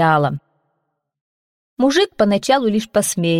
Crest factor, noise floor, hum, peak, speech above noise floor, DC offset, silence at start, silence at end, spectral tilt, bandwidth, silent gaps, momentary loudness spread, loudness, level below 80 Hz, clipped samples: 14 dB; -73 dBFS; none; -4 dBFS; 57 dB; under 0.1%; 0 s; 0 s; -4.5 dB/octave; 16.5 kHz; 1.21-1.77 s; 5 LU; -17 LUFS; -56 dBFS; under 0.1%